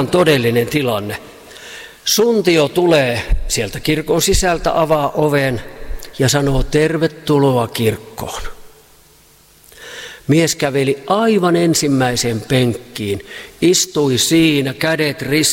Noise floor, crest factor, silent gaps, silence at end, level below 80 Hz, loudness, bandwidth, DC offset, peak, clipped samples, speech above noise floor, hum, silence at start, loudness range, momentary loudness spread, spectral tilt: -48 dBFS; 14 dB; none; 0 s; -30 dBFS; -15 LUFS; 16.5 kHz; under 0.1%; -2 dBFS; under 0.1%; 33 dB; none; 0 s; 5 LU; 15 LU; -4.5 dB/octave